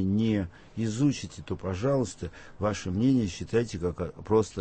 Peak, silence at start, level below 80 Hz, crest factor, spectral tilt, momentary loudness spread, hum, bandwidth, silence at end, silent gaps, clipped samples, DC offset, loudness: -12 dBFS; 0 s; -50 dBFS; 16 dB; -6.5 dB/octave; 11 LU; none; 8.8 kHz; 0 s; none; under 0.1%; under 0.1%; -29 LUFS